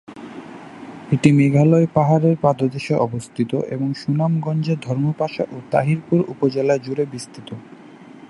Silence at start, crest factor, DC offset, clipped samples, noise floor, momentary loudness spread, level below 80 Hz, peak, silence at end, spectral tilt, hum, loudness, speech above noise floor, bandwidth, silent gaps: 0.1 s; 18 dB; under 0.1%; under 0.1%; -41 dBFS; 21 LU; -60 dBFS; 0 dBFS; 0.05 s; -8 dB/octave; none; -19 LUFS; 23 dB; 11.5 kHz; none